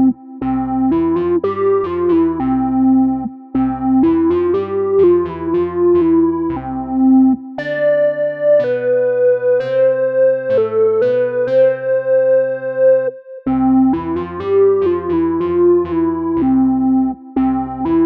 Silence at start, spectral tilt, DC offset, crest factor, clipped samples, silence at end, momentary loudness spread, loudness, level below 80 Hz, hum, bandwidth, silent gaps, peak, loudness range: 0 s; -10 dB/octave; under 0.1%; 12 dB; under 0.1%; 0 s; 7 LU; -15 LUFS; -42 dBFS; none; 4.7 kHz; none; -4 dBFS; 1 LU